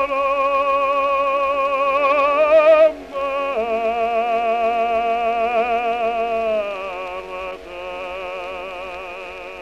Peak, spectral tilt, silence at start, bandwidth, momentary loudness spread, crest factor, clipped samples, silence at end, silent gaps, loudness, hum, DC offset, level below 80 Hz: -4 dBFS; -4 dB/octave; 0 s; 9 kHz; 15 LU; 14 dB; under 0.1%; 0 s; none; -19 LUFS; none; 0.2%; -50 dBFS